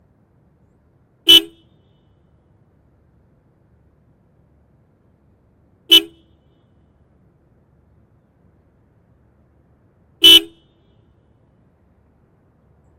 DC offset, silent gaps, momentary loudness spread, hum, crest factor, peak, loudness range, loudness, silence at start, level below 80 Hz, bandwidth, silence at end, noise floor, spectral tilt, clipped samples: under 0.1%; none; 21 LU; none; 22 dB; 0 dBFS; 4 LU; -9 LUFS; 1.25 s; -56 dBFS; 16 kHz; 2.55 s; -57 dBFS; -0.5 dB/octave; under 0.1%